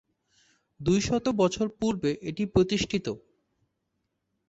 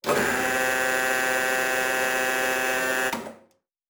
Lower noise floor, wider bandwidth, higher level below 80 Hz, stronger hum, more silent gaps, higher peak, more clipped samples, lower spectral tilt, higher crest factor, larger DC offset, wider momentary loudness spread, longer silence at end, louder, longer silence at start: first, -79 dBFS vs -62 dBFS; second, 8.2 kHz vs over 20 kHz; first, -50 dBFS vs -60 dBFS; neither; neither; about the same, -10 dBFS vs -10 dBFS; neither; first, -5.5 dB/octave vs -1.5 dB/octave; about the same, 20 dB vs 16 dB; neither; first, 8 LU vs 3 LU; first, 1.3 s vs 0.55 s; second, -27 LUFS vs -23 LUFS; first, 0.8 s vs 0.05 s